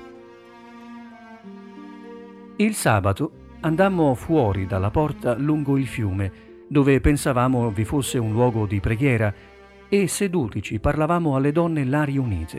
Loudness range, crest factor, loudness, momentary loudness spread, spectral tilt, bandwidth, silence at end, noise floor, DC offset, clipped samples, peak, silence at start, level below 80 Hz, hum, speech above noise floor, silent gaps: 3 LU; 18 dB; -22 LUFS; 22 LU; -6.5 dB/octave; 15.5 kHz; 0 s; -45 dBFS; under 0.1%; under 0.1%; -4 dBFS; 0 s; -38 dBFS; none; 24 dB; none